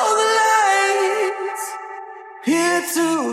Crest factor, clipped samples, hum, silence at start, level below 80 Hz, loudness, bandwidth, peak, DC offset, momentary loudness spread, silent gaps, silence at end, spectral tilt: 14 dB; under 0.1%; none; 0 s; -86 dBFS; -18 LUFS; 16 kHz; -6 dBFS; under 0.1%; 17 LU; none; 0 s; -1.5 dB/octave